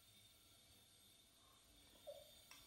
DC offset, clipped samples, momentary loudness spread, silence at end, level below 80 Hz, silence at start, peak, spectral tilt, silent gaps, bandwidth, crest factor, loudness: under 0.1%; under 0.1%; 9 LU; 0 s; -82 dBFS; 0 s; -44 dBFS; -2 dB/octave; none; 16 kHz; 22 dB; -65 LUFS